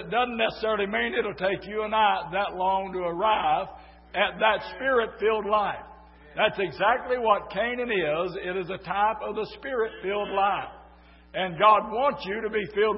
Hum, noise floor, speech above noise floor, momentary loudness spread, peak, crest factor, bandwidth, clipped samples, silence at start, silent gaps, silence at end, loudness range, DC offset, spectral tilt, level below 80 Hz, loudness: none; -52 dBFS; 26 dB; 8 LU; -6 dBFS; 20 dB; 5.8 kHz; under 0.1%; 0 s; none; 0 s; 2 LU; under 0.1%; -8.5 dB/octave; -54 dBFS; -26 LUFS